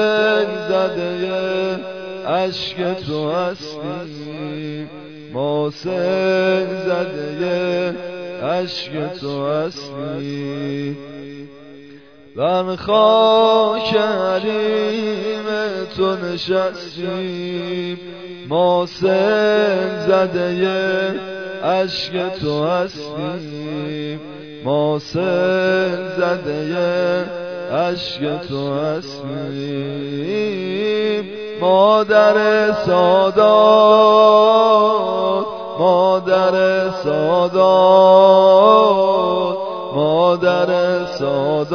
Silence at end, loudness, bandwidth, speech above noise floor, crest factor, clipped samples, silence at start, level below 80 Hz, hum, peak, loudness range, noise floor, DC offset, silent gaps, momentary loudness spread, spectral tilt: 0 s; -17 LUFS; 5.4 kHz; 26 dB; 16 dB; under 0.1%; 0 s; -58 dBFS; none; 0 dBFS; 11 LU; -42 dBFS; 0.2%; none; 16 LU; -6 dB/octave